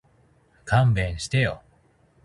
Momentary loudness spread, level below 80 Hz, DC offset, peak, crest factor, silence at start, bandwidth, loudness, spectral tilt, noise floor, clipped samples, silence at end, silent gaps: 18 LU; -42 dBFS; under 0.1%; -6 dBFS; 20 dB; 0.65 s; 11.5 kHz; -23 LUFS; -6 dB/octave; -60 dBFS; under 0.1%; 0.65 s; none